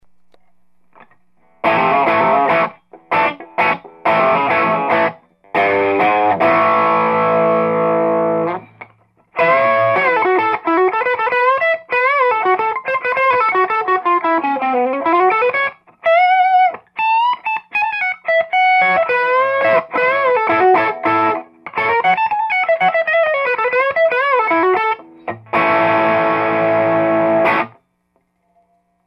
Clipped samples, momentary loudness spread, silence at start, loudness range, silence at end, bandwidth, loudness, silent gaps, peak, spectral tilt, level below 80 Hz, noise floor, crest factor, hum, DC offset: under 0.1%; 6 LU; 1.65 s; 2 LU; 1.4 s; 6 kHz; -15 LUFS; none; 0 dBFS; -7 dB/octave; -62 dBFS; -64 dBFS; 14 dB; none; under 0.1%